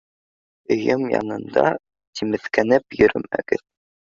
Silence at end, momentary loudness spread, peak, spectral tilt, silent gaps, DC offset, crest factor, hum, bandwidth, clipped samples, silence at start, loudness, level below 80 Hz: 0.6 s; 8 LU; -2 dBFS; -6 dB/octave; 2.07-2.13 s; under 0.1%; 20 dB; none; 7.4 kHz; under 0.1%; 0.7 s; -21 LUFS; -52 dBFS